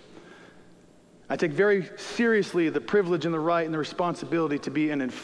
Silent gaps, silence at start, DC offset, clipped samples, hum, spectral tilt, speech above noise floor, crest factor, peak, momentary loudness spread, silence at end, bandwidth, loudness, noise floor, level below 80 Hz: none; 0.1 s; under 0.1%; under 0.1%; none; -6 dB/octave; 29 dB; 16 dB; -12 dBFS; 6 LU; 0 s; 11 kHz; -26 LUFS; -55 dBFS; -68 dBFS